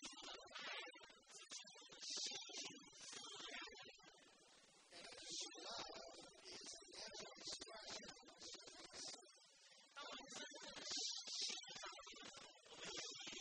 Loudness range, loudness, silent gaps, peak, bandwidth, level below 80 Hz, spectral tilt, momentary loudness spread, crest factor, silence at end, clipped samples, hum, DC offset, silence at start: 5 LU; -52 LUFS; none; -34 dBFS; 10 kHz; -86 dBFS; 0 dB/octave; 15 LU; 20 dB; 0 s; under 0.1%; none; under 0.1%; 0 s